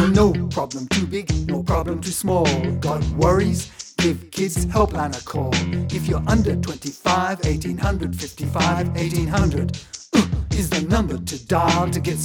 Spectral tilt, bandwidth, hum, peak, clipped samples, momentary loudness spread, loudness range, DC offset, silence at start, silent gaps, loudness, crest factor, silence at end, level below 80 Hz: -5.5 dB/octave; 18.5 kHz; none; -2 dBFS; under 0.1%; 7 LU; 1 LU; under 0.1%; 0 s; none; -21 LUFS; 18 dB; 0 s; -32 dBFS